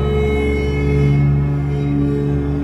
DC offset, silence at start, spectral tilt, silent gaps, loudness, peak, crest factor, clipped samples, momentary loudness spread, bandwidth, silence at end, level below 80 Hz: under 0.1%; 0 s; -9 dB/octave; none; -17 LUFS; -4 dBFS; 12 dB; under 0.1%; 4 LU; 6.2 kHz; 0 s; -24 dBFS